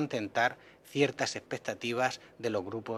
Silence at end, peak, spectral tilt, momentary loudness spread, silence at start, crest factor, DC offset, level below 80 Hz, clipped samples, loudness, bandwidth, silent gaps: 0 s; -12 dBFS; -4 dB/octave; 8 LU; 0 s; 20 dB; under 0.1%; -74 dBFS; under 0.1%; -33 LUFS; 14.5 kHz; none